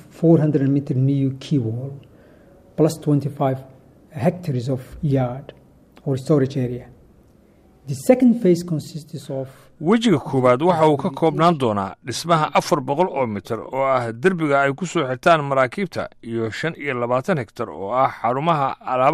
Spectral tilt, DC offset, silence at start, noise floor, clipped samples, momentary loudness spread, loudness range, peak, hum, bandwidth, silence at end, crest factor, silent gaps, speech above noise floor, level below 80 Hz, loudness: -7 dB/octave; under 0.1%; 0.15 s; -52 dBFS; under 0.1%; 13 LU; 5 LU; -2 dBFS; none; 15 kHz; 0 s; 18 dB; none; 33 dB; -54 dBFS; -20 LUFS